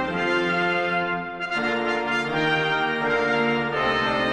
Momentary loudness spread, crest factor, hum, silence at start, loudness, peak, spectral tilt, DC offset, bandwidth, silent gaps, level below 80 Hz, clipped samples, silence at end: 3 LU; 14 dB; none; 0 s; -23 LUFS; -10 dBFS; -5 dB/octave; under 0.1%; 11 kHz; none; -52 dBFS; under 0.1%; 0 s